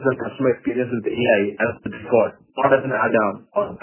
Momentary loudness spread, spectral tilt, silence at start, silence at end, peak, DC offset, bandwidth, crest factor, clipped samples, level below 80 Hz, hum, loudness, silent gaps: 6 LU; -10 dB/octave; 0 s; 0.05 s; -2 dBFS; under 0.1%; 3.2 kHz; 18 dB; under 0.1%; -56 dBFS; none; -21 LUFS; none